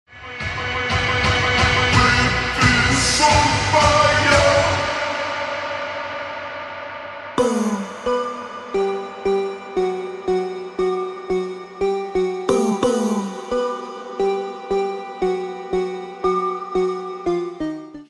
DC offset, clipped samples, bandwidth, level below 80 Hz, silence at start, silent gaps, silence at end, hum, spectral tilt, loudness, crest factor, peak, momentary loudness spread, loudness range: under 0.1%; under 0.1%; 12 kHz; -38 dBFS; 0.1 s; none; 0.05 s; none; -4 dB/octave; -20 LUFS; 18 dB; -2 dBFS; 13 LU; 9 LU